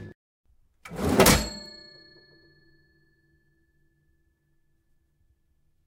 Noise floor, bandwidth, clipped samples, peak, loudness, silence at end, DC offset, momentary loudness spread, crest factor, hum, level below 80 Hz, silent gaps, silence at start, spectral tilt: -68 dBFS; 16 kHz; under 0.1%; -4 dBFS; -22 LUFS; 4.2 s; under 0.1%; 27 LU; 26 dB; none; -44 dBFS; 0.15-0.44 s; 0 s; -3.5 dB/octave